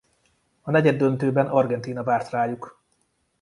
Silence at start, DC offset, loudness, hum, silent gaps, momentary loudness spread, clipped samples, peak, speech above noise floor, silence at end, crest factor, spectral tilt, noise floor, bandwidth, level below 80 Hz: 0.65 s; under 0.1%; -22 LUFS; none; none; 14 LU; under 0.1%; -4 dBFS; 48 dB; 0.7 s; 20 dB; -8 dB/octave; -69 dBFS; 11.5 kHz; -64 dBFS